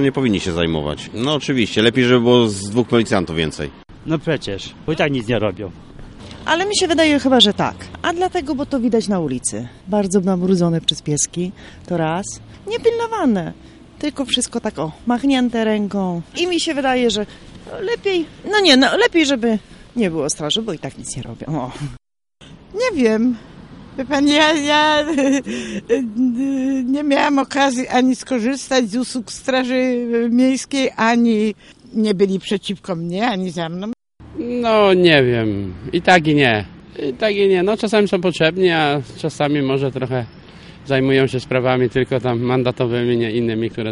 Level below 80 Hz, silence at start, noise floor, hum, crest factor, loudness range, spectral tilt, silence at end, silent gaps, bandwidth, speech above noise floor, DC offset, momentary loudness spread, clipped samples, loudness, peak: -46 dBFS; 0 s; -46 dBFS; none; 18 dB; 5 LU; -4.5 dB/octave; 0 s; none; 11.5 kHz; 29 dB; under 0.1%; 13 LU; under 0.1%; -17 LUFS; 0 dBFS